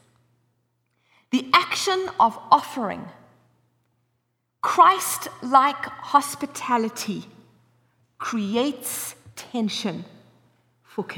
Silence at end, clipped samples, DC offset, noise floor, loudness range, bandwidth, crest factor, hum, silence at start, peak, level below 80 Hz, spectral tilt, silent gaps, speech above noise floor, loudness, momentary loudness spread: 0 s; under 0.1%; under 0.1%; -74 dBFS; 8 LU; over 20 kHz; 22 dB; 60 Hz at -60 dBFS; 1.3 s; -4 dBFS; -72 dBFS; -3 dB/octave; none; 51 dB; -22 LUFS; 16 LU